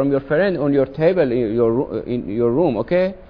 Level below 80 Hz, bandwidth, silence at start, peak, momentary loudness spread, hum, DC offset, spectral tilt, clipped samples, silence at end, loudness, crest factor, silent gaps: -44 dBFS; 5.4 kHz; 0 s; -4 dBFS; 6 LU; none; under 0.1%; -10.5 dB/octave; under 0.1%; 0.05 s; -18 LUFS; 14 dB; none